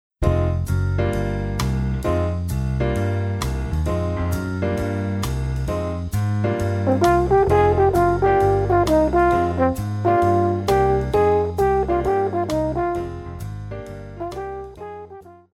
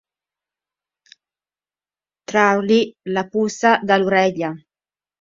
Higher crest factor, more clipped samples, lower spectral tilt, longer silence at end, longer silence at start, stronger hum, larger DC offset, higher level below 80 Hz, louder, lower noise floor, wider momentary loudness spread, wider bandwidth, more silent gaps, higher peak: second, 14 dB vs 20 dB; neither; first, -7.5 dB/octave vs -5 dB/octave; second, 0.2 s vs 0.65 s; second, 0.2 s vs 2.3 s; neither; neither; first, -32 dBFS vs -64 dBFS; about the same, -20 LUFS vs -18 LUFS; second, -41 dBFS vs under -90 dBFS; first, 15 LU vs 12 LU; first, 16 kHz vs 7.6 kHz; neither; second, -6 dBFS vs 0 dBFS